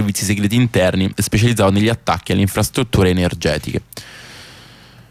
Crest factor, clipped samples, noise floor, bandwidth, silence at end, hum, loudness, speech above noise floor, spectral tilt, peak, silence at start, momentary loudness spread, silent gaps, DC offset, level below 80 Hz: 14 dB; under 0.1%; -42 dBFS; 16 kHz; 0.5 s; none; -16 LUFS; 26 dB; -5.5 dB/octave; -4 dBFS; 0 s; 20 LU; none; under 0.1%; -36 dBFS